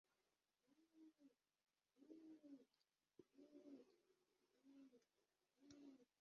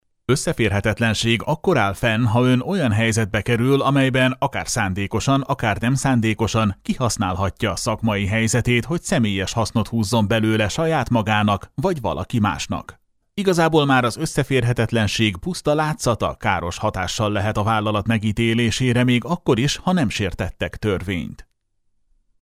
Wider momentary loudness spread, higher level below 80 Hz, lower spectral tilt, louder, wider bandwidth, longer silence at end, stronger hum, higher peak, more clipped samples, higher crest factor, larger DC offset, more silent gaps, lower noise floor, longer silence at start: about the same, 4 LU vs 6 LU; second, under -90 dBFS vs -42 dBFS; about the same, -5 dB/octave vs -5.5 dB/octave; second, -67 LUFS vs -20 LUFS; second, 6.8 kHz vs 15.5 kHz; second, 0.15 s vs 1 s; neither; second, -50 dBFS vs -2 dBFS; neither; about the same, 20 dB vs 16 dB; neither; neither; first, under -90 dBFS vs -66 dBFS; second, 0.05 s vs 0.3 s